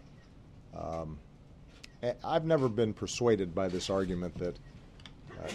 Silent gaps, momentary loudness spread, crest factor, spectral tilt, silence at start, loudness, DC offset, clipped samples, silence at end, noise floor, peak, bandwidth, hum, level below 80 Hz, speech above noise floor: none; 23 LU; 20 dB; -5.5 dB/octave; 0 s; -33 LUFS; under 0.1%; under 0.1%; 0 s; -54 dBFS; -14 dBFS; 12 kHz; none; -54 dBFS; 22 dB